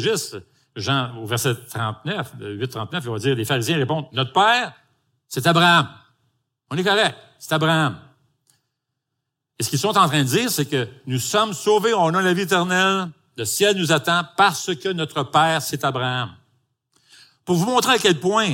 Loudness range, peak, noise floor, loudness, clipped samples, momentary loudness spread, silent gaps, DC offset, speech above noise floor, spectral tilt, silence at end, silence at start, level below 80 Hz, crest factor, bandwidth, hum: 4 LU; -2 dBFS; -80 dBFS; -20 LUFS; under 0.1%; 12 LU; none; under 0.1%; 60 dB; -4 dB/octave; 0 s; 0 s; -66 dBFS; 18 dB; 17 kHz; none